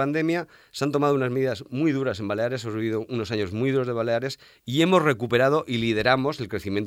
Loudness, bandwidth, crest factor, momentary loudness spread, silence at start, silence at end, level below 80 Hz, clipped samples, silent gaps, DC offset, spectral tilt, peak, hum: -24 LUFS; 16 kHz; 18 dB; 8 LU; 0 s; 0 s; -58 dBFS; under 0.1%; none; under 0.1%; -6 dB/octave; -6 dBFS; none